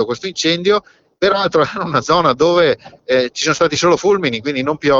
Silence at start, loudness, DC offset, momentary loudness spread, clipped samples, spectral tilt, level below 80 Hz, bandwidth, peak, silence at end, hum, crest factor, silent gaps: 0 s; -15 LUFS; under 0.1%; 6 LU; under 0.1%; -4 dB/octave; -48 dBFS; 7.8 kHz; -2 dBFS; 0 s; none; 14 dB; none